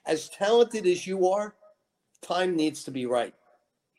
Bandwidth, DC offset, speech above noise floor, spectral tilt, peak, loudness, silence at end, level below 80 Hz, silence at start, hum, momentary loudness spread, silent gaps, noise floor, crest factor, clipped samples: 12.5 kHz; under 0.1%; 45 dB; -4.5 dB/octave; -10 dBFS; -26 LUFS; 0.7 s; -76 dBFS; 0.05 s; none; 10 LU; none; -71 dBFS; 18 dB; under 0.1%